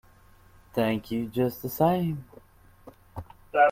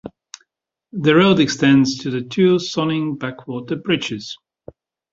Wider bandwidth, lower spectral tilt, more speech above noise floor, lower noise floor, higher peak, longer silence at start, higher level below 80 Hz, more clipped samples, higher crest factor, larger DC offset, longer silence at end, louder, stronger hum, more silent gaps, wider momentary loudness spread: first, 16.5 kHz vs 7.8 kHz; first, -7 dB/octave vs -5.5 dB/octave; second, 29 dB vs 57 dB; second, -56 dBFS vs -75 dBFS; second, -8 dBFS vs -2 dBFS; first, 0.75 s vs 0.05 s; about the same, -56 dBFS vs -56 dBFS; neither; about the same, 20 dB vs 18 dB; neither; second, 0 s vs 0.75 s; second, -28 LUFS vs -17 LUFS; neither; neither; first, 20 LU vs 17 LU